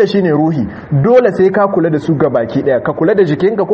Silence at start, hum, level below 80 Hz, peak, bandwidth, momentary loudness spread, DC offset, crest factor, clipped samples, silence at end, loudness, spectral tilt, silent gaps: 0 s; none; -46 dBFS; 0 dBFS; 7.2 kHz; 5 LU; under 0.1%; 12 dB; under 0.1%; 0 s; -12 LUFS; -9 dB/octave; none